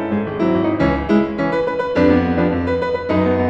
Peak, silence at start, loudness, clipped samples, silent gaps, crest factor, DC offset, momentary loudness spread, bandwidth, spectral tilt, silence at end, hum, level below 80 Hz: -2 dBFS; 0 s; -17 LUFS; under 0.1%; none; 14 dB; under 0.1%; 5 LU; 8 kHz; -8.5 dB/octave; 0 s; none; -38 dBFS